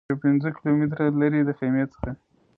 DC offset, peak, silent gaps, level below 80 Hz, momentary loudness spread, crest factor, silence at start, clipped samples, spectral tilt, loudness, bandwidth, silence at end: under 0.1%; -8 dBFS; none; -48 dBFS; 13 LU; 14 dB; 0.1 s; under 0.1%; -11.5 dB/octave; -23 LUFS; 4.5 kHz; 0.45 s